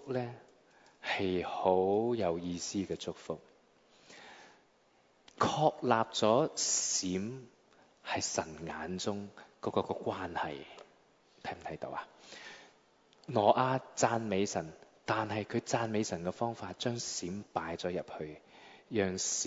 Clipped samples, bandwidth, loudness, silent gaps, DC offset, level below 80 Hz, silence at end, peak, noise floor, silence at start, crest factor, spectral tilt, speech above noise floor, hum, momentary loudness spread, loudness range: under 0.1%; 8 kHz; -34 LUFS; none; under 0.1%; -70 dBFS; 0 s; -12 dBFS; -68 dBFS; 0 s; 24 dB; -3.5 dB/octave; 34 dB; none; 20 LU; 8 LU